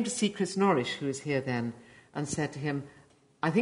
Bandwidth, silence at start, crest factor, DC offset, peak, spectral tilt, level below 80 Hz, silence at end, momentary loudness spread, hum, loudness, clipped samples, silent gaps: 11 kHz; 0 s; 18 dB; under 0.1%; -12 dBFS; -5 dB/octave; -66 dBFS; 0 s; 12 LU; none; -31 LUFS; under 0.1%; none